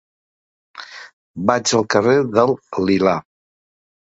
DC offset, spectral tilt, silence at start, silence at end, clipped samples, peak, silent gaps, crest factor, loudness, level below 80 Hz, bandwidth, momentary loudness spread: under 0.1%; -4.5 dB/octave; 0.75 s; 0.95 s; under 0.1%; 0 dBFS; 1.13-1.34 s; 20 dB; -17 LUFS; -54 dBFS; 8 kHz; 21 LU